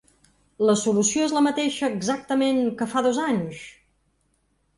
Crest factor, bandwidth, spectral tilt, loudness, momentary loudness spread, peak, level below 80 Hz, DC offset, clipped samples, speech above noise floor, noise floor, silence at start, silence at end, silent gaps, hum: 16 dB; 11.5 kHz; -4 dB/octave; -23 LUFS; 7 LU; -8 dBFS; -64 dBFS; under 0.1%; under 0.1%; 46 dB; -68 dBFS; 0.6 s; 1.05 s; none; none